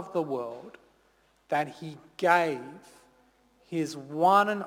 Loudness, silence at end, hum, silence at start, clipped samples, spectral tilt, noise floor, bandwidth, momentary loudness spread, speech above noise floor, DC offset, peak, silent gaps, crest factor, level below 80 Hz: -28 LUFS; 0 s; none; 0 s; under 0.1%; -5.5 dB/octave; -66 dBFS; 18.5 kHz; 21 LU; 38 dB; under 0.1%; -8 dBFS; none; 22 dB; -74 dBFS